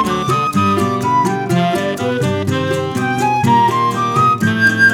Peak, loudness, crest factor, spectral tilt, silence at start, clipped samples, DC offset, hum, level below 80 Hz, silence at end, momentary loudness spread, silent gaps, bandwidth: -2 dBFS; -15 LUFS; 12 dB; -5.5 dB/octave; 0 s; under 0.1%; under 0.1%; none; -48 dBFS; 0 s; 5 LU; none; 18 kHz